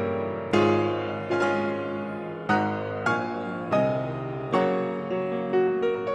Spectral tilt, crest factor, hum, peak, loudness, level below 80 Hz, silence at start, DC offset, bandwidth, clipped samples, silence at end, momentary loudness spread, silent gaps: -7 dB/octave; 18 dB; none; -8 dBFS; -26 LUFS; -62 dBFS; 0 s; under 0.1%; 9.6 kHz; under 0.1%; 0 s; 8 LU; none